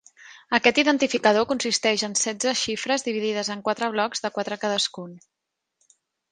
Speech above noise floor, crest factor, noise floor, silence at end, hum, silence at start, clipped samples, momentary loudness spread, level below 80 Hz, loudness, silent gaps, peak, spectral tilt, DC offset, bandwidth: 48 dB; 22 dB; -72 dBFS; 1.15 s; none; 0.2 s; under 0.1%; 8 LU; -66 dBFS; -23 LUFS; none; -2 dBFS; -2 dB/octave; under 0.1%; 10.5 kHz